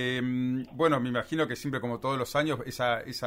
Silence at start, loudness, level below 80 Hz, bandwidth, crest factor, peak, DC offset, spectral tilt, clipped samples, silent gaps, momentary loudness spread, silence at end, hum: 0 s; -29 LUFS; -60 dBFS; 16 kHz; 18 dB; -12 dBFS; under 0.1%; -5.5 dB/octave; under 0.1%; none; 5 LU; 0 s; none